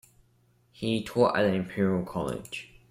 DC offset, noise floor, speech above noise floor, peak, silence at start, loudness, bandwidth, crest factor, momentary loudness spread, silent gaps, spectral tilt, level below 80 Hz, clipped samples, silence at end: under 0.1%; -65 dBFS; 38 dB; -10 dBFS; 0.8 s; -28 LUFS; 15.5 kHz; 20 dB; 13 LU; none; -6.5 dB/octave; -58 dBFS; under 0.1%; 0.25 s